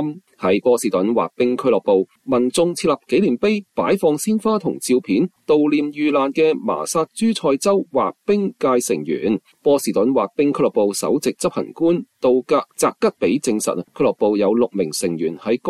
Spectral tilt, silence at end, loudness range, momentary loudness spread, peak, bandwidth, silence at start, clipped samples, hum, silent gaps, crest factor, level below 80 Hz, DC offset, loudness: -5 dB/octave; 0 s; 1 LU; 5 LU; -6 dBFS; 14.5 kHz; 0 s; under 0.1%; none; none; 12 dB; -60 dBFS; under 0.1%; -19 LUFS